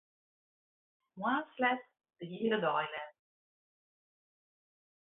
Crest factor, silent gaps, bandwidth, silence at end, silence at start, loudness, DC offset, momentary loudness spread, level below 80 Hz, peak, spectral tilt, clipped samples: 22 dB; none; 3.9 kHz; 1.95 s; 1.15 s; -35 LUFS; under 0.1%; 15 LU; -86 dBFS; -16 dBFS; 0 dB/octave; under 0.1%